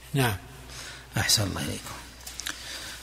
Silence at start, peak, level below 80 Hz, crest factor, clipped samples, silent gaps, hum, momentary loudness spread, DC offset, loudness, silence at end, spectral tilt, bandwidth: 0 s; -10 dBFS; -50 dBFS; 22 dB; under 0.1%; none; none; 17 LU; under 0.1%; -28 LUFS; 0 s; -3 dB/octave; 16 kHz